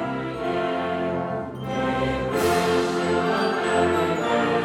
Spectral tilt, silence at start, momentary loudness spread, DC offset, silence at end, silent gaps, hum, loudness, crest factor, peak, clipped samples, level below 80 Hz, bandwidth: -5.5 dB/octave; 0 s; 7 LU; under 0.1%; 0 s; none; none; -23 LUFS; 14 dB; -8 dBFS; under 0.1%; -48 dBFS; 17.5 kHz